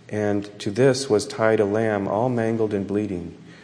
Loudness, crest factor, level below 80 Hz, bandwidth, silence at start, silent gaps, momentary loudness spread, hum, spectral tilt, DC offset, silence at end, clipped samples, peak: -22 LUFS; 18 dB; -60 dBFS; 11 kHz; 0.1 s; none; 9 LU; none; -6 dB/octave; under 0.1%; 0.05 s; under 0.1%; -4 dBFS